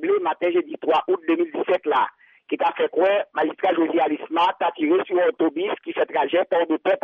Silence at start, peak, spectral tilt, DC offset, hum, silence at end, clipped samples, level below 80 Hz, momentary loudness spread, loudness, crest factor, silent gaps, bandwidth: 0 s; -10 dBFS; -6 dB/octave; under 0.1%; none; 0.05 s; under 0.1%; -72 dBFS; 4 LU; -22 LUFS; 12 dB; none; 5.2 kHz